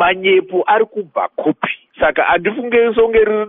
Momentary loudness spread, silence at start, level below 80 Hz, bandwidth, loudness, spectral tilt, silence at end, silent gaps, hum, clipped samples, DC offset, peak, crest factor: 8 LU; 0 s; -46 dBFS; 3.9 kHz; -15 LUFS; -2 dB/octave; 0 s; none; none; under 0.1%; under 0.1%; -2 dBFS; 14 dB